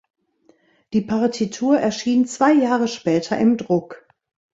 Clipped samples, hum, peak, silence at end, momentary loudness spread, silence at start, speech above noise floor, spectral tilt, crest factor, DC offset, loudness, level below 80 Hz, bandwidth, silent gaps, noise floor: under 0.1%; none; -2 dBFS; 0.55 s; 7 LU; 0.9 s; 40 dB; -5.5 dB/octave; 18 dB; under 0.1%; -19 LUFS; -62 dBFS; 7.8 kHz; none; -59 dBFS